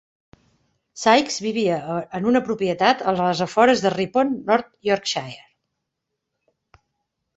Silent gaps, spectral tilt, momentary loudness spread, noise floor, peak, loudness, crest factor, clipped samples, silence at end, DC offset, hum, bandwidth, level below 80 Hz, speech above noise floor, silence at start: none; -4.5 dB/octave; 8 LU; -80 dBFS; -2 dBFS; -20 LUFS; 20 dB; under 0.1%; 2 s; under 0.1%; none; 8.2 kHz; -62 dBFS; 60 dB; 0.95 s